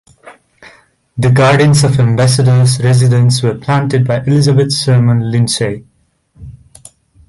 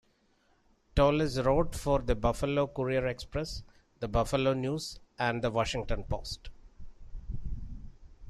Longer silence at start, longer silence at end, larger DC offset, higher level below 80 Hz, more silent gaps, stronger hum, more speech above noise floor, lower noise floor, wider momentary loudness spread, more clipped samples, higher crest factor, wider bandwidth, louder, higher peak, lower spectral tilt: second, 0.25 s vs 0.95 s; first, 0.75 s vs 0 s; neither; about the same, -42 dBFS vs -42 dBFS; neither; neither; first, 43 dB vs 39 dB; second, -52 dBFS vs -69 dBFS; second, 6 LU vs 16 LU; neither; second, 12 dB vs 20 dB; second, 11.5 kHz vs 13.5 kHz; first, -11 LUFS vs -31 LUFS; first, 0 dBFS vs -12 dBFS; about the same, -6 dB/octave vs -6 dB/octave